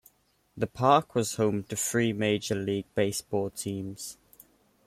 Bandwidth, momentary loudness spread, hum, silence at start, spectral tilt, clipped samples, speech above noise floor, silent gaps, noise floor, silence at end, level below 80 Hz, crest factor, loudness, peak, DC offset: 16 kHz; 12 LU; none; 0.55 s; -4.5 dB/octave; under 0.1%; 39 dB; none; -67 dBFS; 0.75 s; -64 dBFS; 22 dB; -28 LUFS; -8 dBFS; under 0.1%